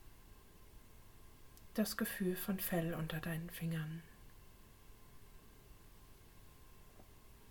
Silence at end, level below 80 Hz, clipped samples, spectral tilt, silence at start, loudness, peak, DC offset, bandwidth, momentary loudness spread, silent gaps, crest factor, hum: 0 s; -62 dBFS; under 0.1%; -5.5 dB/octave; 0 s; -41 LUFS; -24 dBFS; under 0.1%; 19 kHz; 24 LU; none; 22 dB; none